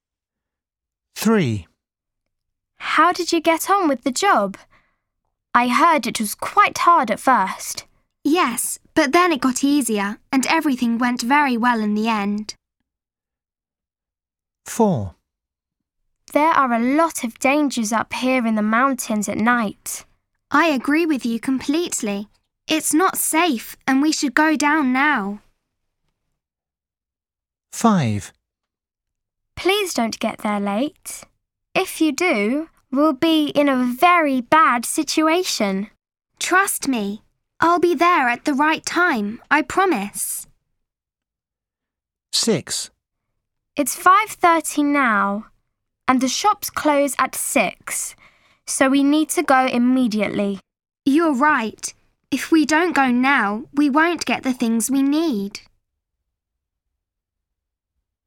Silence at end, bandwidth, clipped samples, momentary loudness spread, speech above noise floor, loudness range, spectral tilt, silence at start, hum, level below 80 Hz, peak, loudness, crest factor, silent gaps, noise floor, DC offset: 2.7 s; 17.5 kHz; under 0.1%; 11 LU; over 72 dB; 7 LU; -3.5 dB/octave; 1.15 s; none; -58 dBFS; 0 dBFS; -19 LUFS; 20 dB; none; under -90 dBFS; under 0.1%